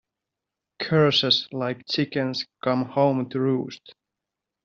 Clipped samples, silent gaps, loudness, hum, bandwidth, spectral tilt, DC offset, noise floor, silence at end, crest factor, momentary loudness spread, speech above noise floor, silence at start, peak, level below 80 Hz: under 0.1%; none; -23 LUFS; none; 7.4 kHz; -4 dB/octave; under 0.1%; -86 dBFS; 0.75 s; 20 dB; 10 LU; 62 dB; 0.8 s; -6 dBFS; -66 dBFS